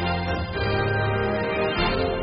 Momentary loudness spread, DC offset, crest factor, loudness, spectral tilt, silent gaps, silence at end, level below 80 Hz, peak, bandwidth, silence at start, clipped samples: 3 LU; under 0.1%; 14 dB; -24 LUFS; -4 dB/octave; none; 0 s; -36 dBFS; -10 dBFS; 5.4 kHz; 0 s; under 0.1%